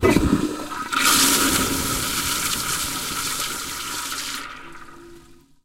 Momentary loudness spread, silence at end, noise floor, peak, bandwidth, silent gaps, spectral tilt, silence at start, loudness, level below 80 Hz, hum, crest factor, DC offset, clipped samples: 14 LU; 0.3 s; -48 dBFS; -2 dBFS; 16.5 kHz; none; -2.5 dB/octave; 0 s; -21 LUFS; -40 dBFS; none; 20 dB; under 0.1%; under 0.1%